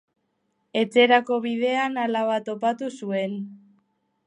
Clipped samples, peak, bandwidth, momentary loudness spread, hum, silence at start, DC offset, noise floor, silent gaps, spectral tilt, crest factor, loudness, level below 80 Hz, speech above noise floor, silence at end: under 0.1%; -4 dBFS; 11 kHz; 13 LU; none; 0.75 s; under 0.1%; -73 dBFS; none; -5 dB/octave; 20 dB; -23 LUFS; -80 dBFS; 50 dB; 0.7 s